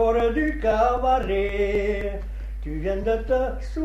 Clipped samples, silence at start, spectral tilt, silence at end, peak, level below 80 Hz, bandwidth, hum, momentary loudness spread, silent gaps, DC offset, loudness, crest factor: under 0.1%; 0 s; -7 dB/octave; 0 s; -10 dBFS; -30 dBFS; 8 kHz; none; 11 LU; none; under 0.1%; -24 LUFS; 14 dB